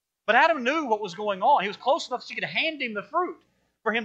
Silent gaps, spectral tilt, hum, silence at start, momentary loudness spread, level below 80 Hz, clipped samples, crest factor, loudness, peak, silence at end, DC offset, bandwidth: none; -3.5 dB/octave; none; 0.3 s; 11 LU; -80 dBFS; under 0.1%; 20 dB; -25 LUFS; -6 dBFS; 0 s; under 0.1%; 8.4 kHz